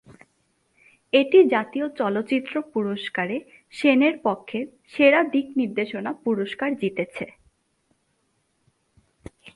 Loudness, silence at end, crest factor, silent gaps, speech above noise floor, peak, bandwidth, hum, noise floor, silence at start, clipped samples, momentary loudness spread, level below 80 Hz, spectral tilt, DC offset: -23 LUFS; 0.05 s; 20 dB; none; 48 dB; -4 dBFS; 11.5 kHz; none; -70 dBFS; 1.15 s; under 0.1%; 15 LU; -66 dBFS; -6.5 dB/octave; under 0.1%